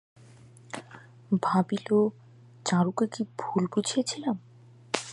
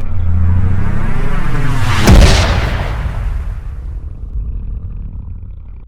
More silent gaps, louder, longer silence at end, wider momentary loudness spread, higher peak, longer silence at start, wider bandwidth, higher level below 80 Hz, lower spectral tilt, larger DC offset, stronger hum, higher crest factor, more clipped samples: neither; second, -28 LUFS vs -15 LUFS; about the same, 0 s vs 0.05 s; second, 16 LU vs 19 LU; second, -4 dBFS vs 0 dBFS; first, 0.75 s vs 0 s; second, 11.5 kHz vs 13.5 kHz; second, -76 dBFS vs -16 dBFS; about the same, -5.5 dB/octave vs -5.5 dB/octave; neither; neither; first, 24 dB vs 12 dB; second, under 0.1% vs 0.2%